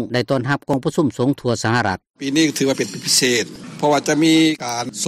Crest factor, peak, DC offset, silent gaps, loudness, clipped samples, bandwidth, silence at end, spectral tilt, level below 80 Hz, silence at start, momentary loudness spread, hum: 14 dB; -4 dBFS; under 0.1%; 2.10-2.14 s; -18 LUFS; under 0.1%; 16 kHz; 0 s; -4 dB/octave; -56 dBFS; 0 s; 8 LU; none